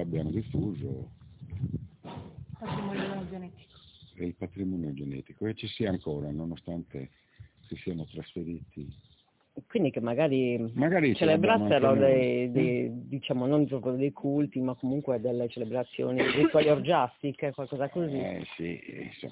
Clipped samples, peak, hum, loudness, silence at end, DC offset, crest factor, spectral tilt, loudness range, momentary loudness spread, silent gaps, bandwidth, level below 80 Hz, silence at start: under 0.1%; -12 dBFS; none; -29 LUFS; 0 s; under 0.1%; 18 dB; -10.5 dB/octave; 13 LU; 19 LU; none; 4 kHz; -56 dBFS; 0 s